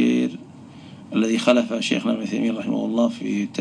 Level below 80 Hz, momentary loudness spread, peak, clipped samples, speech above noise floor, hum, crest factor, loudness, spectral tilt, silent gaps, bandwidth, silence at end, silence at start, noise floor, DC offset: -70 dBFS; 23 LU; -2 dBFS; under 0.1%; 21 dB; none; 20 dB; -22 LUFS; -5 dB/octave; none; 10.5 kHz; 0 s; 0 s; -42 dBFS; under 0.1%